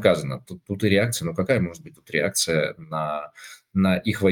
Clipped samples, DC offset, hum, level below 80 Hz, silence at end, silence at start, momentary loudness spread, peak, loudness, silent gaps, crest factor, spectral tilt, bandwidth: under 0.1%; under 0.1%; none; -56 dBFS; 0 s; 0 s; 13 LU; -2 dBFS; -24 LUFS; none; 20 dB; -5 dB/octave; 18 kHz